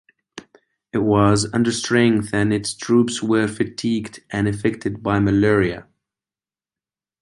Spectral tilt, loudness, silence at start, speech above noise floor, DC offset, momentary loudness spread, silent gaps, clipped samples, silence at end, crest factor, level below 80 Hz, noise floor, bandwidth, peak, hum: -5.5 dB/octave; -19 LUFS; 0.35 s; over 71 dB; under 0.1%; 8 LU; none; under 0.1%; 1.4 s; 18 dB; -46 dBFS; under -90 dBFS; 11.5 kHz; -2 dBFS; none